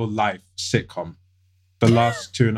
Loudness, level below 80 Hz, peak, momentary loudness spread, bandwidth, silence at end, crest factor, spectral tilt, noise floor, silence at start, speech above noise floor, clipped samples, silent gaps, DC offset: -21 LUFS; -54 dBFS; -2 dBFS; 16 LU; 12 kHz; 0 s; 20 dB; -6 dB/octave; -61 dBFS; 0 s; 40 dB; under 0.1%; none; under 0.1%